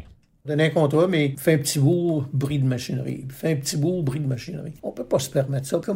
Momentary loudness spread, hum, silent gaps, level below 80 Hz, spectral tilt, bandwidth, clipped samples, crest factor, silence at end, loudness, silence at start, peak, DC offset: 11 LU; none; none; -54 dBFS; -6 dB/octave; 16 kHz; under 0.1%; 16 dB; 0 s; -23 LUFS; 0 s; -6 dBFS; under 0.1%